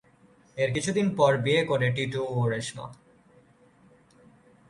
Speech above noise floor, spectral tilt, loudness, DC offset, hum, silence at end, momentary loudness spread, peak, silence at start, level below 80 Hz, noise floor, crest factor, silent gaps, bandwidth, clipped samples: 33 dB; -5.5 dB/octave; -26 LUFS; under 0.1%; none; 1.75 s; 16 LU; -8 dBFS; 0.55 s; -62 dBFS; -59 dBFS; 20 dB; none; 11.5 kHz; under 0.1%